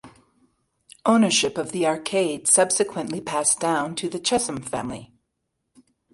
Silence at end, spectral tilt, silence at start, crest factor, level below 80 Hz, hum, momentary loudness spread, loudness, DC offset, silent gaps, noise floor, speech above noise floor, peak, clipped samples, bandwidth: 1.1 s; -2.5 dB/octave; 0.05 s; 22 dB; -60 dBFS; none; 12 LU; -22 LUFS; under 0.1%; none; -77 dBFS; 55 dB; -4 dBFS; under 0.1%; 11.5 kHz